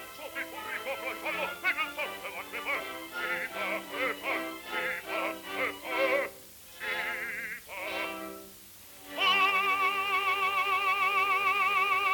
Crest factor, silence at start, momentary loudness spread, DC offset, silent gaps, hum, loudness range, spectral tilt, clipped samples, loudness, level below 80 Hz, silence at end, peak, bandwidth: 16 dB; 0 s; 13 LU; under 0.1%; none; none; 7 LU; -1.5 dB/octave; under 0.1%; -30 LUFS; -68 dBFS; 0 s; -14 dBFS; 19 kHz